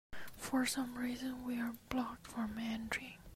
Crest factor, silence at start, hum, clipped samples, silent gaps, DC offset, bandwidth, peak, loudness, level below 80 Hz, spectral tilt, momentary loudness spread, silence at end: 22 dB; 0.1 s; none; under 0.1%; none; under 0.1%; 16 kHz; -18 dBFS; -40 LUFS; -62 dBFS; -3.5 dB/octave; 7 LU; 0 s